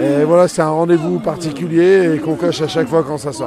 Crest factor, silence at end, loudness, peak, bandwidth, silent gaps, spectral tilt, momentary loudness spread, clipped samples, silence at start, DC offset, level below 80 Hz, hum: 14 dB; 0 s; -15 LUFS; 0 dBFS; 13 kHz; none; -6.5 dB/octave; 8 LU; under 0.1%; 0 s; under 0.1%; -52 dBFS; none